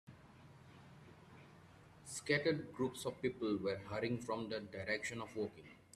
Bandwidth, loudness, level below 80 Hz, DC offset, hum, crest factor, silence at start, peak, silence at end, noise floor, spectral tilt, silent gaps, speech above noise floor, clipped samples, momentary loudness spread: 14 kHz; -41 LUFS; -74 dBFS; under 0.1%; none; 22 dB; 0.05 s; -22 dBFS; 0.2 s; -62 dBFS; -5 dB/octave; none; 21 dB; under 0.1%; 24 LU